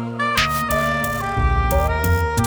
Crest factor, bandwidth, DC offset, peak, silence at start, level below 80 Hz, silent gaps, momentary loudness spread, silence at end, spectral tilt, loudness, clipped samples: 14 dB; over 20 kHz; under 0.1%; -4 dBFS; 0 s; -26 dBFS; none; 3 LU; 0 s; -5 dB/octave; -19 LUFS; under 0.1%